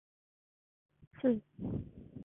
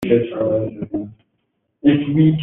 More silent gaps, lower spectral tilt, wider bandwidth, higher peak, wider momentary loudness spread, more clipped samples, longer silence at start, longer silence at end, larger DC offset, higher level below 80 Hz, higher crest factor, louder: first, 1.07-1.11 s vs none; about the same, -8.5 dB/octave vs -8 dB/octave; second, 3.7 kHz vs 4.1 kHz; second, -18 dBFS vs -2 dBFS; about the same, 10 LU vs 12 LU; neither; first, 1 s vs 0 s; about the same, 0 s vs 0 s; neither; second, -60 dBFS vs -52 dBFS; first, 22 dB vs 16 dB; second, -37 LUFS vs -19 LUFS